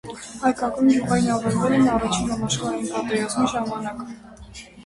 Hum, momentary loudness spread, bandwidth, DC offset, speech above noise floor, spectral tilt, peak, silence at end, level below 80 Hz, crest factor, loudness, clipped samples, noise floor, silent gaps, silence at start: none; 18 LU; 11.5 kHz; under 0.1%; 20 dB; -5 dB/octave; -6 dBFS; 0 s; -46 dBFS; 16 dB; -22 LUFS; under 0.1%; -42 dBFS; none; 0.05 s